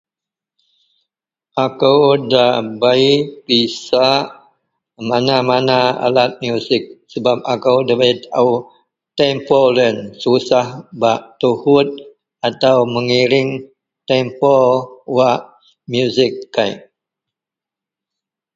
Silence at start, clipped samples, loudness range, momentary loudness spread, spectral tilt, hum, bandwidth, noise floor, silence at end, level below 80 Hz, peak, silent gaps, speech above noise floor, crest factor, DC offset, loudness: 1.55 s; under 0.1%; 2 LU; 9 LU; -5.5 dB/octave; none; 7.8 kHz; -87 dBFS; 1.75 s; -60 dBFS; 0 dBFS; none; 73 dB; 16 dB; under 0.1%; -15 LUFS